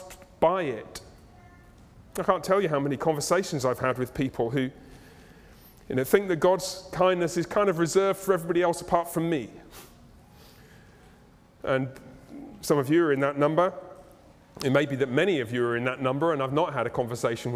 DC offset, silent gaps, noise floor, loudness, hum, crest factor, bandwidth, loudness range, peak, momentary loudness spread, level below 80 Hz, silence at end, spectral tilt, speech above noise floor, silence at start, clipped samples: under 0.1%; none; -55 dBFS; -26 LUFS; none; 22 dB; 16.5 kHz; 6 LU; -6 dBFS; 14 LU; -56 dBFS; 0 s; -5.5 dB/octave; 30 dB; 0 s; under 0.1%